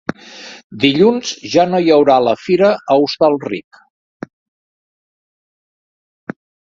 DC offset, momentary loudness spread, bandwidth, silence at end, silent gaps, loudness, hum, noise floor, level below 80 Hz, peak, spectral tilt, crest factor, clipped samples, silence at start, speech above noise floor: under 0.1%; 23 LU; 7.6 kHz; 3.1 s; 0.64-0.70 s; -13 LUFS; none; -36 dBFS; -58 dBFS; 0 dBFS; -5.5 dB/octave; 16 dB; under 0.1%; 0.3 s; 23 dB